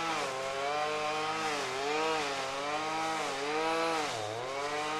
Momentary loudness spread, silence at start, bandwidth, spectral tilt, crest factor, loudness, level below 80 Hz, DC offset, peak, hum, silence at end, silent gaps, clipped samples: 4 LU; 0 s; 15.5 kHz; -2.5 dB/octave; 14 dB; -33 LUFS; -68 dBFS; under 0.1%; -20 dBFS; none; 0 s; none; under 0.1%